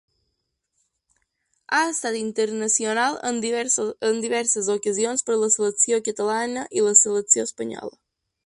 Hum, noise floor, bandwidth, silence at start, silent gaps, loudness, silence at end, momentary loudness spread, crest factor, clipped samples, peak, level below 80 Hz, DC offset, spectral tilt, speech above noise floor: none; -76 dBFS; 11.5 kHz; 1.7 s; none; -21 LUFS; 0.55 s; 9 LU; 22 dB; under 0.1%; 0 dBFS; -70 dBFS; under 0.1%; -1.5 dB/octave; 54 dB